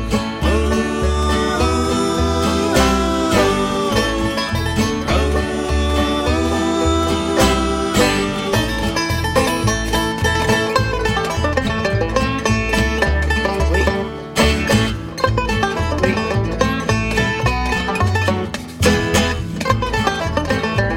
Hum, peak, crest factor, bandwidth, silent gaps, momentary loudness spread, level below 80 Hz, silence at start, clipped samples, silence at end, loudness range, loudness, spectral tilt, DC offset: none; 0 dBFS; 16 dB; 16.5 kHz; none; 4 LU; -26 dBFS; 0 s; under 0.1%; 0 s; 1 LU; -17 LUFS; -5 dB/octave; under 0.1%